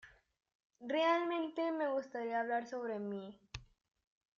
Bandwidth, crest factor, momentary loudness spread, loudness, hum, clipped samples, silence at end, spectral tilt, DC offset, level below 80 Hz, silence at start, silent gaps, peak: 7.2 kHz; 18 dB; 19 LU; -37 LUFS; none; under 0.1%; 0.75 s; -5.5 dB/octave; under 0.1%; -70 dBFS; 0.05 s; 0.55-0.70 s; -22 dBFS